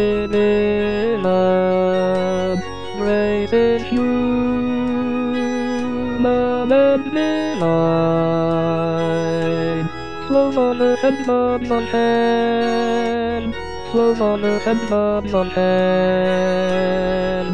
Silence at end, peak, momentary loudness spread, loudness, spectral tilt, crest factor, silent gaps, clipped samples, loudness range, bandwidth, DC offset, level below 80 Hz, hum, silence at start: 0 s; -4 dBFS; 5 LU; -18 LUFS; -7 dB/octave; 14 dB; none; under 0.1%; 1 LU; 9.4 kHz; 2%; -42 dBFS; none; 0 s